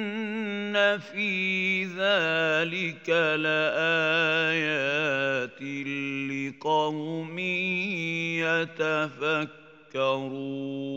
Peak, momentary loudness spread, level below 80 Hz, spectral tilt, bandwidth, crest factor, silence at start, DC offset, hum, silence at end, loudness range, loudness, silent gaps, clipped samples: -10 dBFS; 9 LU; -80 dBFS; -5 dB/octave; 16 kHz; 18 dB; 0 s; under 0.1%; none; 0 s; 4 LU; -26 LUFS; none; under 0.1%